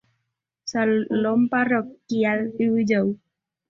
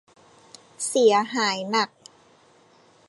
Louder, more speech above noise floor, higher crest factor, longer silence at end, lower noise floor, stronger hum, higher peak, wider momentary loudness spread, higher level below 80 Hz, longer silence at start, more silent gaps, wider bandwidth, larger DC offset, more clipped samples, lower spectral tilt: about the same, -22 LUFS vs -22 LUFS; first, 57 dB vs 35 dB; about the same, 16 dB vs 20 dB; second, 0.55 s vs 1.25 s; first, -79 dBFS vs -57 dBFS; neither; about the same, -8 dBFS vs -6 dBFS; about the same, 8 LU vs 10 LU; first, -64 dBFS vs -80 dBFS; second, 0.65 s vs 0.8 s; neither; second, 7.4 kHz vs 11.5 kHz; neither; neither; first, -6 dB/octave vs -2.5 dB/octave